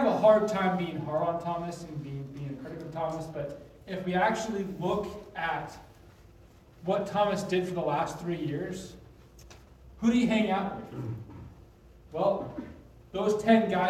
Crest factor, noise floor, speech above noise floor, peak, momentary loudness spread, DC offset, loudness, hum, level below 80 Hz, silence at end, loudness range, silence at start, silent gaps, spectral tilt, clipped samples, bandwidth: 22 dB; -55 dBFS; 26 dB; -8 dBFS; 16 LU; under 0.1%; -30 LUFS; none; -58 dBFS; 0 s; 3 LU; 0 s; none; -6.5 dB/octave; under 0.1%; 14.5 kHz